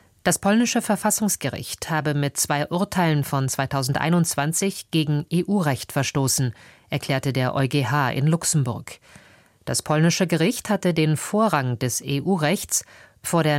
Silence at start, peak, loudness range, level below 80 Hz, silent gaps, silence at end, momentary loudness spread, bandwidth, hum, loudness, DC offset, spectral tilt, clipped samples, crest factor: 0.25 s; -6 dBFS; 2 LU; -56 dBFS; none; 0 s; 6 LU; 16.5 kHz; none; -22 LUFS; under 0.1%; -4.5 dB/octave; under 0.1%; 16 dB